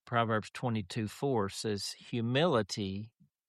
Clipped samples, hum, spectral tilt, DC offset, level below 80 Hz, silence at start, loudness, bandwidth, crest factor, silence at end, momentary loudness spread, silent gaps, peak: under 0.1%; none; -5.5 dB/octave; under 0.1%; -70 dBFS; 0.05 s; -33 LUFS; 13.5 kHz; 18 dB; 0.4 s; 9 LU; none; -16 dBFS